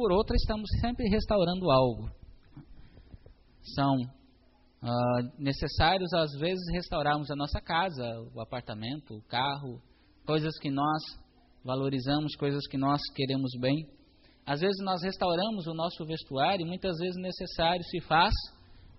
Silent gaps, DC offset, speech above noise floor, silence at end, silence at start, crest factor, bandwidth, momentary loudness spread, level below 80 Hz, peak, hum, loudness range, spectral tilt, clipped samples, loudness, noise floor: none; under 0.1%; 32 dB; 0.05 s; 0 s; 20 dB; 6 kHz; 13 LU; -44 dBFS; -10 dBFS; none; 4 LU; -4.5 dB/octave; under 0.1%; -30 LUFS; -62 dBFS